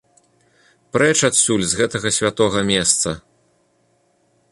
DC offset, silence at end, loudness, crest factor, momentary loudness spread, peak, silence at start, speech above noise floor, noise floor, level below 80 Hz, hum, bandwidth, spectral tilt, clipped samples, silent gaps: under 0.1%; 1.35 s; -17 LUFS; 20 dB; 7 LU; 0 dBFS; 0.95 s; 44 dB; -62 dBFS; -50 dBFS; none; 11.5 kHz; -2.5 dB/octave; under 0.1%; none